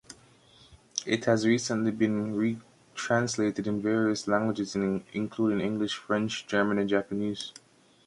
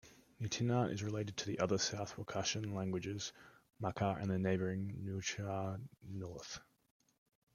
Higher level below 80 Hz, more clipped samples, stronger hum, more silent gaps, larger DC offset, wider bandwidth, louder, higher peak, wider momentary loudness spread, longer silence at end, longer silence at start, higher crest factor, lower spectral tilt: first, -64 dBFS vs -70 dBFS; neither; neither; neither; neither; second, 11.5 kHz vs 13.5 kHz; first, -28 LUFS vs -40 LUFS; first, -8 dBFS vs -20 dBFS; second, 8 LU vs 12 LU; second, 0.55 s vs 0.95 s; about the same, 0.1 s vs 0.05 s; about the same, 20 dB vs 20 dB; about the same, -5 dB/octave vs -5 dB/octave